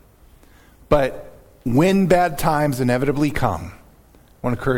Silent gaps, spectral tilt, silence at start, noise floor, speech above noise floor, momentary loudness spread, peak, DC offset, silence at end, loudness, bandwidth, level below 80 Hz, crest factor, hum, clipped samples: none; -6.5 dB/octave; 0.9 s; -50 dBFS; 32 dB; 14 LU; -2 dBFS; under 0.1%; 0 s; -20 LUFS; 17.5 kHz; -36 dBFS; 20 dB; none; under 0.1%